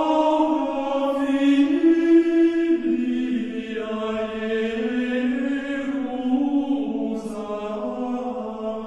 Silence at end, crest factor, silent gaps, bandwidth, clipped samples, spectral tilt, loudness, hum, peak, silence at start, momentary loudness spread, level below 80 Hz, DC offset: 0 s; 14 dB; none; 8.4 kHz; under 0.1%; -6 dB/octave; -22 LUFS; none; -8 dBFS; 0 s; 11 LU; -56 dBFS; under 0.1%